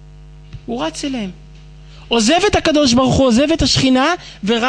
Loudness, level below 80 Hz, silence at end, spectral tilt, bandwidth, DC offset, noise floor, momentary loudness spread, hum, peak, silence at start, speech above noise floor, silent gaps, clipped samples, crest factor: -14 LUFS; -34 dBFS; 0 s; -4 dB/octave; 10 kHz; under 0.1%; -38 dBFS; 12 LU; none; -2 dBFS; 0 s; 24 dB; none; under 0.1%; 14 dB